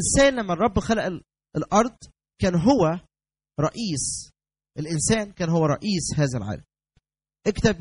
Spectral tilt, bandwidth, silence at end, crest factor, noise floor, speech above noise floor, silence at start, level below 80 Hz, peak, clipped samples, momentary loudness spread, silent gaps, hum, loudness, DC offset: -5 dB/octave; 11 kHz; 0 s; 18 dB; -74 dBFS; 52 dB; 0 s; -42 dBFS; -6 dBFS; under 0.1%; 14 LU; none; none; -24 LUFS; under 0.1%